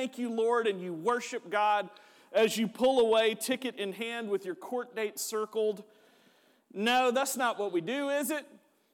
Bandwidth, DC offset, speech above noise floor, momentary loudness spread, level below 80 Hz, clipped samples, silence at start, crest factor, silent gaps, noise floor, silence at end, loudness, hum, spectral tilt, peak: 18 kHz; under 0.1%; 35 dB; 10 LU; -78 dBFS; under 0.1%; 0 s; 14 dB; none; -65 dBFS; 0.5 s; -30 LUFS; none; -3 dB/octave; -16 dBFS